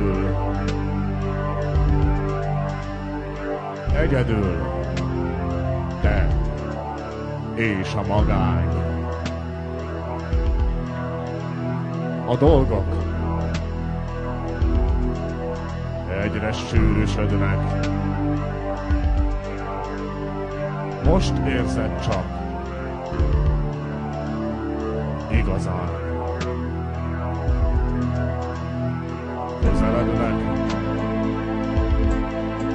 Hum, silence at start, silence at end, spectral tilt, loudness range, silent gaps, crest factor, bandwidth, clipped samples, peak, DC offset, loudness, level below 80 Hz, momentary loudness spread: none; 0 s; 0 s; -8 dB/octave; 3 LU; none; 20 dB; 9.6 kHz; under 0.1%; -4 dBFS; under 0.1%; -24 LUFS; -28 dBFS; 8 LU